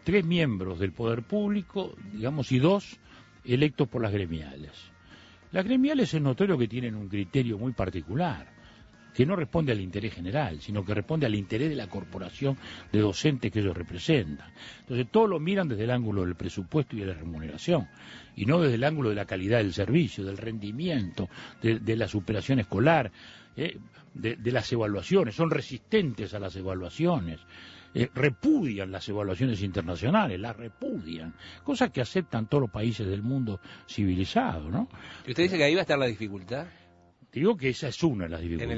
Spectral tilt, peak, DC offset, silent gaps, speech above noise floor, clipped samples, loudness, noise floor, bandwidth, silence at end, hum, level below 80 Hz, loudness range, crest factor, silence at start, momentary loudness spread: -7 dB/octave; -8 dBFS; under 0.1%; none; 30 dB; under 0.1%; -29 LUFS; -59 dBFS; 8 kHz; 0 s; none; -52 dBFS; 2 LU; 20 dB; 0.05 s; 13 LU